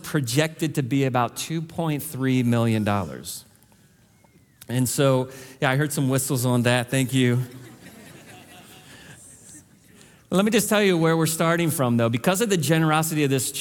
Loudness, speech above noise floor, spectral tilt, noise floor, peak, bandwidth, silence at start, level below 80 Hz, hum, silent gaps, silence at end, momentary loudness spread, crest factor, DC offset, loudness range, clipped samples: -22 LUFS; 35 dB; -5 dB/octave; -57 dBFS; -4 dBFS; 18 kHz; 0.05 s; -62 dBFS; none; none; 0 s; 9 LU; 18 dB; under 0.1%; 6 LU; under 0.1%